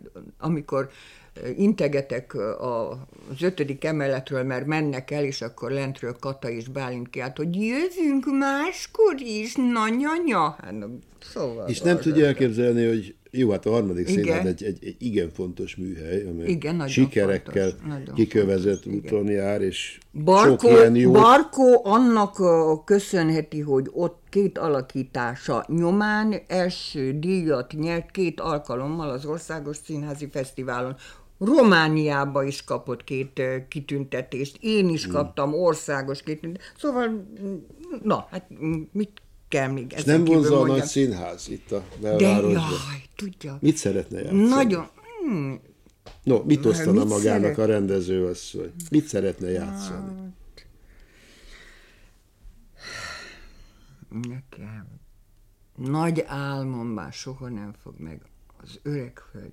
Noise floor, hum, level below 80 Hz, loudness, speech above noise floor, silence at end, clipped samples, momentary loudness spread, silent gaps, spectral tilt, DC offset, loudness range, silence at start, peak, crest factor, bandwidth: -56 dBFS; none; -54 dBFS; -23 LUFS; 33 dB; 0 s; under 0.1%; 16 LU; none; -6 dB/octave; under 0.1%; 13 LU; 0.05 s; -4 dBFS; 20 dB; 15 kHz